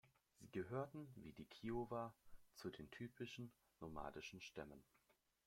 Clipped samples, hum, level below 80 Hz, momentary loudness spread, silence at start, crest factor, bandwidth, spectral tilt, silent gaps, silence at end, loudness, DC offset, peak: under 0.1%; none; -72 dBFS; 12 LU; 0.05 s; 20 dB; 16.5 kHz; -6 dB/octave; none; 0.35 s; -53 LUFS; under 0.1%; -34 dBFS